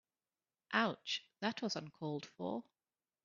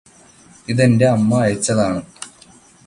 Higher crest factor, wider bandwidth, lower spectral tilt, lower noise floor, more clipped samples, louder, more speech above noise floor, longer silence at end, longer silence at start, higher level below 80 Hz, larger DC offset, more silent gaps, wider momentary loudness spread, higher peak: first, 24 dB vs 16 dB; second, 7.2 kHz vs 11.5 kHz; second, -2.5 dB/octave vs -6 dB/octave; first, under -90 dBFS vs -47 dBFS; neither; second, -40 LUFS vs -16 LUFS; first, over 50 dB vs 32 dB; about the same, 0.65 s vs 0.6 s; about the same, 0.7 s vs 0.7 s; second, -86 dBFS vs -50 dBFS; neither; neither; second, 8 LU vs 21 LU; second, -18 dBFS vs -2 dBFS